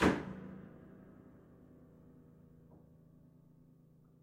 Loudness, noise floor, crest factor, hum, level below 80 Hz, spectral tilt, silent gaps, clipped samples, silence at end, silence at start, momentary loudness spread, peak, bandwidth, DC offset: -41 LUFS; -64 dBFS; 28 dB; none; -60 dBFS; -6 dB/octave; none; under 0.1%; 3.15 s; 0 s; 18 LU; -14 dBFS; 15.5 kHz; under 0.1%